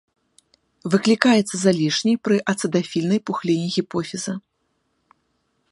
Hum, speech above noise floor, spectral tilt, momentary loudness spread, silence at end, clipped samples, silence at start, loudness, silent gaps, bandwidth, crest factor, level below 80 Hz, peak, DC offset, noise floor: none; 51 dB; -5 dB/octave; 11 LU; 1.3 s; under 0.1%; 0.85 s; -20 LUFS; none; 11.5 kHz; 22 dB; -66 dBFS; 0 dBFS; under 0.1%; -71 dBFS